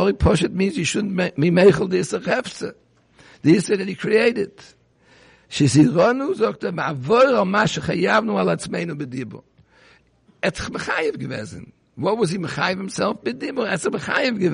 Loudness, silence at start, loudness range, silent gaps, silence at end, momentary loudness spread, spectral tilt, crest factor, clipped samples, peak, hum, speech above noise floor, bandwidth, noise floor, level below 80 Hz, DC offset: -20 LUFS; 0 s; 7 LU; none; 0 s; 14 LU; -5.5 dB/octave; 18 dB; under 0.1%; -2 dBFS; none; 37 dB; 10.5 kHz; -57 dBFS; -42 dBFS; under 0.1%